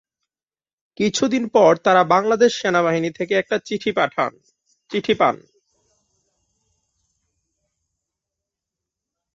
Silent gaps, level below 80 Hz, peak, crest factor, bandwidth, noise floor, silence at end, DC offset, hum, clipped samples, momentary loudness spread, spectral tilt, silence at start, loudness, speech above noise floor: none; -64 dBFS; -2 dBFS; 20 dB; 7.8 kHz; under -90 dBFS; 4 s; under 0.1%; none; under 0.1%; 9 LU; -4.5 dB/octave; 1 s; -19 LUFS; over 72 dB